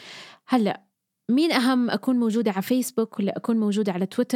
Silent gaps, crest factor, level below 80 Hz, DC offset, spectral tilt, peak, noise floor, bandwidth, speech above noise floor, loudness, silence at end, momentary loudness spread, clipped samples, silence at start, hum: none; 20 dB; -82 dBFS; under 0.1%; -5.5 dB/octave; -4 dBFS; -44 dBFS; 16 kHz; 21 dB; -24 LUFS; 0 s; 9 LU; under 0.1%; 0 s; none